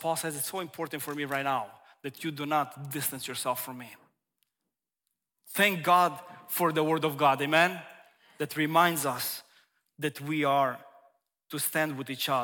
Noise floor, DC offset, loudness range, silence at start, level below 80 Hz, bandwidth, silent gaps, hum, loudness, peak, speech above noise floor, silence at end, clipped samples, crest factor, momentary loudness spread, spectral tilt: -87 dBFS; under 0.1%; 8 LU; 0 s; -78 dBFS; 18 kHz; none; none; -29 LUFS; -8 dBFS; 58 dB; 0 s; under 0.1%; 22 dB; 16 LU; -3.5 dB/octave